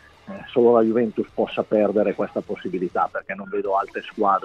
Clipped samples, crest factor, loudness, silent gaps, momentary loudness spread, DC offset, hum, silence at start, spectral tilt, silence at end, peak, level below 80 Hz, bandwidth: under 0.1%; 16 dB; -22 LUFS; none; 12 LU; under 0.1%; none; 0.25 s; -8 dB/octave; 0.05 s; -6 dBFS; -60 dBFS; 6.6 kHz